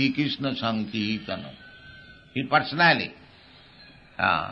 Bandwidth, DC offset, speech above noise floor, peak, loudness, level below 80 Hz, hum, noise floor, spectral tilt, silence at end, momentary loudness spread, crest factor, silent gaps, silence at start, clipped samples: 6.8 kHz; under 0.1%; 27 dB; -6 dBFS; -25 LUFS; -60 dBFS; none; -52 dBFS; -6.5 dB/octave; 0 s; 25 LU; 22 dB; none; 0 s; under 0.1%